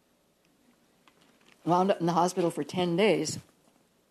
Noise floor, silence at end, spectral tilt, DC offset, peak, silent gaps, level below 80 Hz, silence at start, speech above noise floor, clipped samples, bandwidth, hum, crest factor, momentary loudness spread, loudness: -68 dBFS; 0.7 s; -5.5 dB/octave; under 0.1%; -10 dBFS; none; -76 dBFS; 1.65 s; 41 dB; under 0.1%; 13.5 kHz; none; 20 dB; 10 LU; -27 LUFS